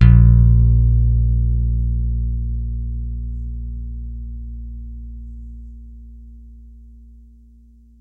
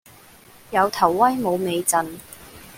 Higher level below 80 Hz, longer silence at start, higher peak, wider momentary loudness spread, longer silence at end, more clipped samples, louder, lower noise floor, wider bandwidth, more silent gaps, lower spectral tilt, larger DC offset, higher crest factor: first, -20 dBFS vs -58 dBFS; second, 0 s vs 0.7 s; about the same, 0 dBFS vs -2 dBFS; first, 24 LU vs 21 LU; first, 1.15 s vs 0 s; neither; about the same, -18 LUFS vs -20 LUFS; about the same, -47 dBFS vs -48 dBFS; second, 3 kHz vs 17 kHz; neither; first, -11 dB/octave vs -3.5 dB/octave; neither; about the same, 18 dB vs 20 dB